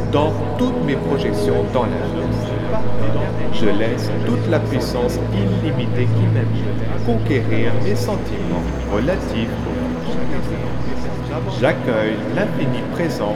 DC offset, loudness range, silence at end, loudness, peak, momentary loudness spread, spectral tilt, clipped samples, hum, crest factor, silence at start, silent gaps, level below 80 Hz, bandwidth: under 0.1%; 3 LU; 0 s; -20 LUFS; -2 dBFS; 5 LU; -7.5 dB/octave; under 0.1%; none; 14 dB; 0 s; none; -32 dBFS; 13 kHz